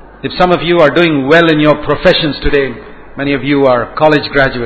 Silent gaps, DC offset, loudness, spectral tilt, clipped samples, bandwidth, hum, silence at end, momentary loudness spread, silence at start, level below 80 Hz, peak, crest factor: none; under 0.1%; -10 LUFS; -7 dB/octave; 0.9%; 8 kHz; none; 0 s; 11 LU; 0 s; -30 dBFS; 0 dBFS; 10 dB